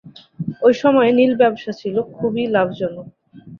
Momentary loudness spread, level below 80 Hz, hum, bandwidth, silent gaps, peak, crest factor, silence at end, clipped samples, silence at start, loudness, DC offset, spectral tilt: 13 LU; -60 dBFS; none; 7 kHz; none; -2 dBFS; 16 dB; 0.05 s; under 0.1%; 0.05 s; -17 LUFS; under 0.1%; -7 dB/octave